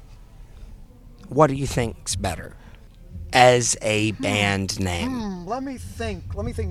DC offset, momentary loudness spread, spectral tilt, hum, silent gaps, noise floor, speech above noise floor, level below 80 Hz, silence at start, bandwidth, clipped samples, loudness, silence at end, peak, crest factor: under 0.1%; 15 LU; -4 dB/octave; none; none; -44 dBFS; 22 dB; -40 dBFS; 0 s; 15.5 kHz; under 0.1%; -22 LUFS; 0 s; 0 dBFS; 24 dB